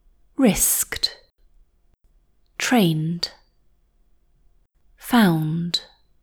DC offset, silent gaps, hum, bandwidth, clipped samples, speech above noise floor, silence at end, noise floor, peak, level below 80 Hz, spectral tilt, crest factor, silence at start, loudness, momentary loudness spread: under 0.1%; none; none; over 20 kHz; under 0.1%; 40 dB; 0.4 s; -60 dBFS; -4 dBFS; -48 dBFS; -4 dB/octave; 20 dB; 0.4 s; -21 LUFS; 12 LU